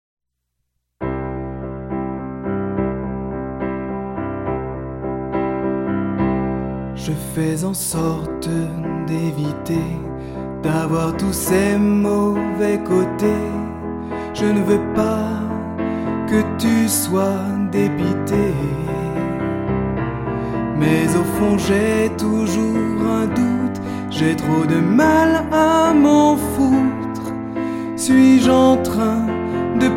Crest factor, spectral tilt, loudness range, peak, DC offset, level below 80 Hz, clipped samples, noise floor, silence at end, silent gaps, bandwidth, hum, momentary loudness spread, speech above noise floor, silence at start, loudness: 16 dB; -6 dB/octave; 9 LU; -2 dBFS; under 0.1%; -38 dBFS; under 0.1%; -74 dBFS; 0 s; none; 16.5 kHz; none; 12 LU; 58 dB; 1 s; -19 LUFS